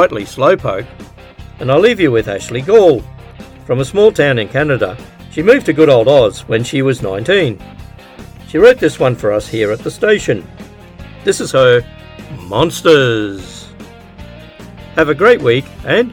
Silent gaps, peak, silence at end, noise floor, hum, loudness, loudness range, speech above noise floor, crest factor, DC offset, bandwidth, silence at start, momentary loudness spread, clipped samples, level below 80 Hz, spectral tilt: none; 0 dBFS; 0 s; -35 dBFS; none; -12 LUFS; 3 LU; 23 dB; 14 dB; under 0.1%; 17 kHz; 0 s; 15 LU; 0.1%; -40 dBFS; -5.5 dB/octave